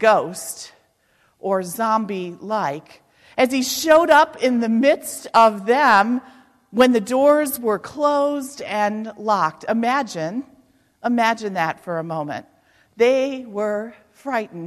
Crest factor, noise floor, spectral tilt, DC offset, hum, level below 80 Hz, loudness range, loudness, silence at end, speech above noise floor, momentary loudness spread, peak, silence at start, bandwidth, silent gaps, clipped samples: 16 dB; -62 dBFS; -4 dB/octave; under 0.1%; none; -64 dBFS; 7 LU; -19 LUFS; 0 s; 43 dB; 14 LU; -4 dBFS; 0 s; 14.5 kHz; none; under 0.1%